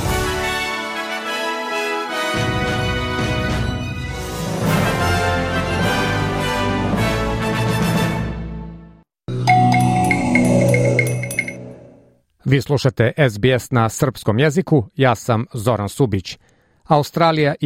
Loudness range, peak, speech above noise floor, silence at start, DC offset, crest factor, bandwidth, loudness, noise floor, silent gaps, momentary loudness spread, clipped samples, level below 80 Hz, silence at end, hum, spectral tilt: 4 LU; -2 dBFS; 35 dB; 0 s; under 0.1%; 16 dB; 16 kHz; -18 LUFS; -52 dBFS; none; 10 LU; under 0.1%; -36 dBFS; 0 s; none; -5.5 dB/octave